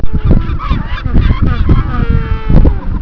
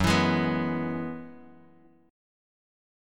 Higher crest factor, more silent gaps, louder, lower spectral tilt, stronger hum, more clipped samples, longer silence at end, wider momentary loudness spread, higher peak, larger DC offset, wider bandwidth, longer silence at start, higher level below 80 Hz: second, 10 dB vs 20 dB; neither; first, -13 LUFS vs -27 LUFS; first, -10 dB/octave vs -5.5 dB/octave; neither; first, 1% vs under 0.1%; second, 0 s vs 1.65 s; second, 6 LU vs 18 LU; first, 0 dBFS vs -10 dBFS; neither; second, 5.4 kHz vs 17.5 kHz; about the same, 0 s vs 0 s; first, -12 dBFS vs -50 dBFS